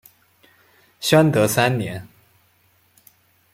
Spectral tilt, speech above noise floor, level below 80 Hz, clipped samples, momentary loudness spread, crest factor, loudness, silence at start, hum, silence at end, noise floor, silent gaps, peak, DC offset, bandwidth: -5 dB/octave; 43 dB; -58 dBFS; under 0.1%; 14 LU; 20 dB; -18 LUFS; 1 s; none; 1.45 s; -60 dBFS; none; -2 dBFS; under 0.1%; 16.5 kHz